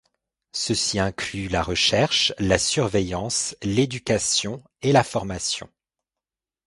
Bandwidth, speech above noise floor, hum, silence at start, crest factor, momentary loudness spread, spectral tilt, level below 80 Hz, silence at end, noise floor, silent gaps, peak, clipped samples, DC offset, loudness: 11.5 kHz; 66 dB; none; 0.55 s; 22 dB; 8 LU; -3.5 dB/octave; -44 dBFS; 1 s; -89 dBFS; none; -2 dBFS; under 0.1%; under 0.1%; -22 LUFS